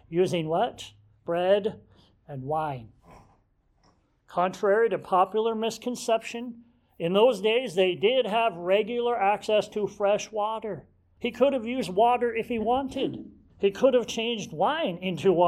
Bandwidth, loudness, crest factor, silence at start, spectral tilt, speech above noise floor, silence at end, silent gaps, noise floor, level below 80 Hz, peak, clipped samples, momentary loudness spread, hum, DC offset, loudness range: 14 kHz; -26 LUFS; 18 dB; 0.1 s; -5 dB/octave; 41 dB; 0 s; none; -66 dBFS; -62 dBFS; -8 dBFS; under 0.1%; 12 LU; none; under 0.1%; 6 LU